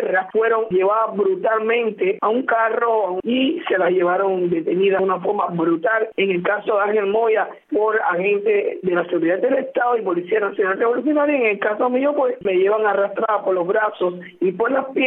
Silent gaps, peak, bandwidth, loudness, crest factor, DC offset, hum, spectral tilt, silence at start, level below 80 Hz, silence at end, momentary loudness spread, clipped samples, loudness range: none; -6 dBFS; 4 kHz; -19 LUFS; 12 dB; under 0.1%; none; -9.5 dB/octave; 0 s; -68 dBFS; 0 s; 3 LU; under 0.1%; 1 LU